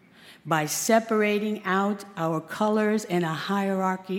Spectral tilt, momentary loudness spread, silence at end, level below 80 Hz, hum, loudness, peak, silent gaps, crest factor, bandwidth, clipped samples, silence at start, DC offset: -4.5 dB/octave; 7 LU; 0 s; -74 dBFS; none; -25 LUFS; -8 dBFS; none; 16 dB; 17 kHz; under 0.1%; 0.25 s; under 0.1%